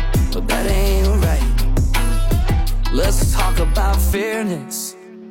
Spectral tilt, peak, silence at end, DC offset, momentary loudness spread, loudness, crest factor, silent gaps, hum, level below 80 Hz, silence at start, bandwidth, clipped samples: -5 dB/octave; -4 dBFS; 0 s; under 0.1%; 6 LU; -19 LUFS; 12 dB; none; none; -16 dBFS; 0 s; 16.5 kHz; under 0.1%